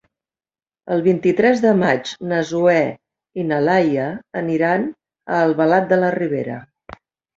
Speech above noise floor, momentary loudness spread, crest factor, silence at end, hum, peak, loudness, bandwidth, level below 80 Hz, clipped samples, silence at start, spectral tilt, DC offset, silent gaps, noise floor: over 73 dB; 10 LU; 18 dB; 0.45 s; none; -2 dBFS; -18 LUFS; 7.8 kHz; -60 dBFS; under 0.1%; 0.85 s; -7 dB/octave; under 0.1%; none; under -90 dBFS